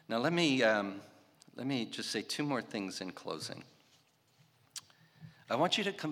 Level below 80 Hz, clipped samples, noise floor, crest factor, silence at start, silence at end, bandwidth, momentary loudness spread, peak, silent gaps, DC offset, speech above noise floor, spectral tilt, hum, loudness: -88 dBFS; under 0.1%; -69 dBFS; 24 dB; 0.1 s; 0 s; 16.5 kHz; 19 LU; -14 dBFS; none; under 0.1%; 35 dB; -4 dB/octave; none; -34 LUFS